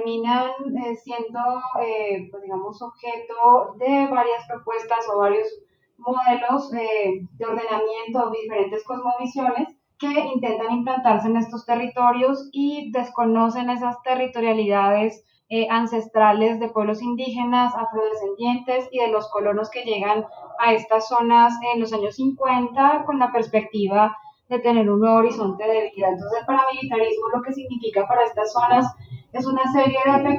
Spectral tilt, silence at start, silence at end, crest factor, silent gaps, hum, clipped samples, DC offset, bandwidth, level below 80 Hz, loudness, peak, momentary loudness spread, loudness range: -6 dB/octave; 0 s; 0 s; 16 dB; none; none; under 0.1%; under 0.1%; 7.4 kHz; -68 dBFS; -21 LUFS; -4 dBFS; 10 LU; 4 LU